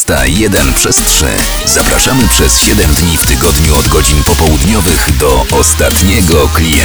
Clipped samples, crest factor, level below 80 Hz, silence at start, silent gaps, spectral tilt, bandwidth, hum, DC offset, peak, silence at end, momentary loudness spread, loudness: 0.7%; 8 dB; -14 dBFS; 0 s; none; -3.5 dB/octave; over 20 kHz; none; under 0.1%; 0 dBFS; 0 s; 3 LU; -7 LUFS